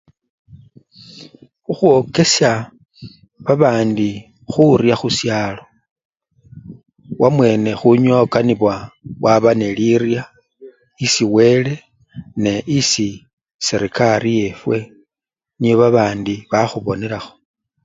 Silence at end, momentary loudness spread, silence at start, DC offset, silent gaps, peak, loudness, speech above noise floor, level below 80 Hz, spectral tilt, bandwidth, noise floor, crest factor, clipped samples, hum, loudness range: 0.55 s; 14 LU; 0.55 s; under 0.1%; 5.91-5.96 s, 6.05-6.10 s, 13.33-13.37 s, 13.54-13.59 s; 0 dBFS; -16 LUFS; 73 dB; -52 dBFS; -5 dB/octave; 7.8 kHz; -88 dBFS; 16 dB; under 0.1%; none; 3 LU